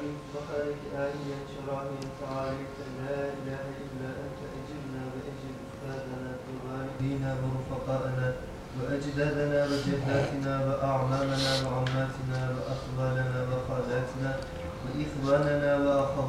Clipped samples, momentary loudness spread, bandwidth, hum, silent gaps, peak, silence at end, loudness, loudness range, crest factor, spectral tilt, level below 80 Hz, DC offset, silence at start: under 0.1%; 12 LU; 13.5 kHz; none; none; -14 dBFS; 0 s; -32 LUFS; 9 LU; 18 dB; -6.5 dB/octave; -50 dBFS; under 0.1%; 0 s